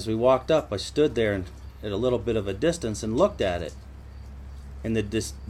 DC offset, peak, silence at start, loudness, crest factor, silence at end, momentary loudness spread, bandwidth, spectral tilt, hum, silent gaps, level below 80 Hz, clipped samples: under 0.1%; -8 dBFS; 0 s; -26 LUFS; 18 dB; 0 s; 20 LU; 15.5 kHz; -5.5 dB/octave; none; none; -42 dBFS; under 0.1%